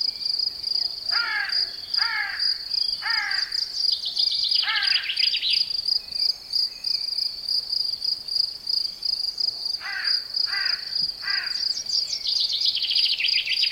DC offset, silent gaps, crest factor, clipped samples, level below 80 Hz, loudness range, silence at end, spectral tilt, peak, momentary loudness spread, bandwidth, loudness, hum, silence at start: under 0.1%; none; 16 dB; under 0.1%; -62 dBFS; 3 LU; 0 s; 2 dB/octave; -8 dBFS; 5 LU; 16.5 kHz; -22 LUFS; none; 0 s